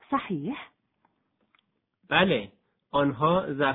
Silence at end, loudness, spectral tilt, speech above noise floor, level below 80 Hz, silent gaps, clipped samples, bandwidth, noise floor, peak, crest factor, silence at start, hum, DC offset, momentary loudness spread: 0 s; -26 LUFS; -9 dB/octave; 46 dB; -60 dBFS; none; under 0.1%; 4.1 kHz; -72 dBFS; -6 dBFS; 22 dB; 0.1 s; none; under 0.1%; 13 LU